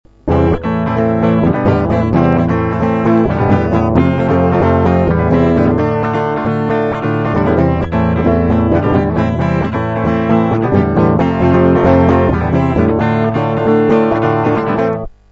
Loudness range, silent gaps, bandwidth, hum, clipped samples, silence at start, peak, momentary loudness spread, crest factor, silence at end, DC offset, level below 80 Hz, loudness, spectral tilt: 2 LU; none; 7.2 kHz; none; under 0.1%; 0.25 s; 0 dBFS; 4 LU; 12 dB; 0.25 s; under 0.1%; -28 dBFS; -13 LUFS; -9.5 dB/octave